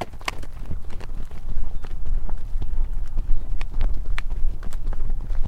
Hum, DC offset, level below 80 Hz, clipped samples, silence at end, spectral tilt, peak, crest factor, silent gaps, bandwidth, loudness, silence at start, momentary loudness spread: none; under 0.1%; -22 dBFS; under 0.1%; 0 s; -5.5 dB/octave; -4 dBFS; 14 dB; none; 5.6 kHz; -33 LUFS; 0 s; 6 LU